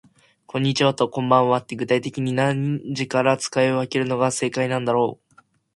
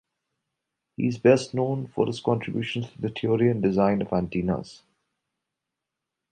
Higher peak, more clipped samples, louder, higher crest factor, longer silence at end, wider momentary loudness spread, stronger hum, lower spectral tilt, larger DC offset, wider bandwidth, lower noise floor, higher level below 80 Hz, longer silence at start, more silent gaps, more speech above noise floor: first, -2 dBFS vs -6 dBFS; neither; first, -21 LUFS vs -25 LUFS; about the same, 20 dB vs 22 dB; second, 0.6 s vs 1.55 s; second, 6 LU vs 10 LU; neither; second, -5.5 dB/octave vs -7 dB/octave; neither; first, 11.5 kHz vs 9.4 kHz; second, -58 dBFS vs -85 dBFS; second, -64 dBFS vs -56 dBFS; second, 0.55 s vs 1 s; neither; second, 37 dB vs 61 dB